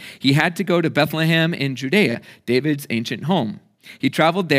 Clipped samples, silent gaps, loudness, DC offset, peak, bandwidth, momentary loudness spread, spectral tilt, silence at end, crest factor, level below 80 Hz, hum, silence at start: under 0.1%; none; -20 LUFS; under 0.1%; -2 dBFS; 16 kHz; 7 LU; -6 dB/octave; 0 s; 18 dB; -68 dBFS; none; 0 s